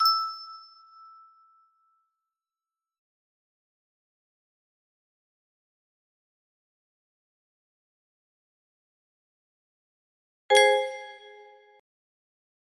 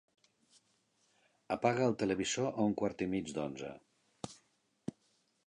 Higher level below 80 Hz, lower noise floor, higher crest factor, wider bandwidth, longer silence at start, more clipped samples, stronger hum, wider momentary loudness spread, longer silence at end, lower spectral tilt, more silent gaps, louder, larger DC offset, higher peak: second, -88 dBFS vs -68 dBFS; first, under -90 dBFS vs -76 dBFS; about the same, 26 dB vs 22 dB; first, 14.5 kHz vs 11 kHz; second, 0 s vs 1.5 s; neither; neither; first, 26 LU vs 17 LU; first, 1.65 s vs 1.1 s; second, 1.5 dB/octave vs -5 dB/octave; first, 2.98-10.49 s vs none; first, -23 LUFS vs -35 LUFS; neither; first, -8 dBFS vs -16 dBFS